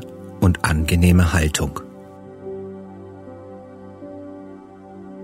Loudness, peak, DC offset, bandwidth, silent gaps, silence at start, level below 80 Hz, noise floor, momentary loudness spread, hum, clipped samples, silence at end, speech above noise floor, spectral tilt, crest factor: -18 LUFS; -2 dBFS; under 0.1%; 16 kHz; none; 0 s; -32 dBFS; -40 dBFS; 24 LU; none; under 0.1%; 0 s; 23 dB; -5.5 dB/octave; 20 dB